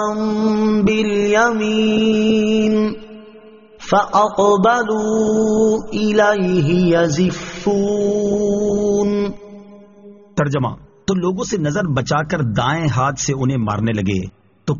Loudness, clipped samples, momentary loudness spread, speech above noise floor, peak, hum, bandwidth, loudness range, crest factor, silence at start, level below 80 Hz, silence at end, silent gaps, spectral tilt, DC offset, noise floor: -17 LUFS; under 0.1%; 7 LU; 26 dB; -2 dBFS; none; 7.4 kHz; 5 LU; 16 dB; 0 s; -44 dBFS; 0 s; none; -5.5 dB/octave; under 0.1%; -42 dBFS